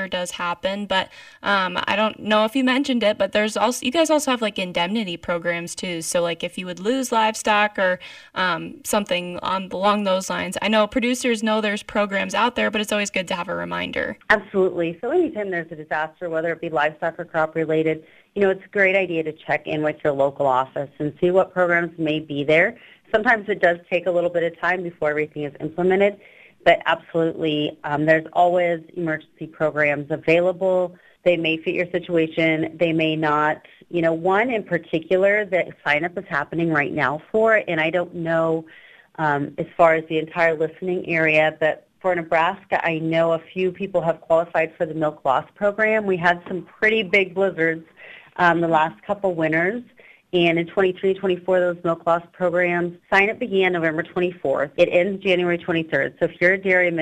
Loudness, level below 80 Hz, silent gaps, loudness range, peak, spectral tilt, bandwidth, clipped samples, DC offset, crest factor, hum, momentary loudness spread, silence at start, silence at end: -21 LUFS; -58 dBFS; none; 2 LU; -2 dBFS; -4.5 dB/octave; 15.5 kHz; under 0.1%; under 0.1%; 20 dB; none; 8 LU; 0 s; 0 s